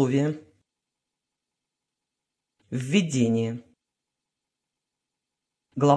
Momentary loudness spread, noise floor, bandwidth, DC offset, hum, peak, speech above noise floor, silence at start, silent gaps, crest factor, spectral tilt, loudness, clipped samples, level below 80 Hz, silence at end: 16 LU; -86 dBFS; 11 kHz; under 0.1%; none; -6 dBFS; 62 dB; 0 s; none; 22 dB; -6.5 dB/octave; -26 LUFS; under 0.1%; -72 dBFS; 0 s